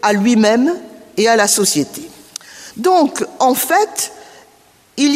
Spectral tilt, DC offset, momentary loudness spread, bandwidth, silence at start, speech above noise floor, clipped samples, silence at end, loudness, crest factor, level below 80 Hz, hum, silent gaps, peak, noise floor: -3 dB/octave; under 0.1%; 20 LU; 15.5 kHz; 0.05 s; 36 dB; under 0.1%; 0 s; -14 LUFS; 16 dB; -62 dBFS; none; none; 0 dBFS; -50 dBFS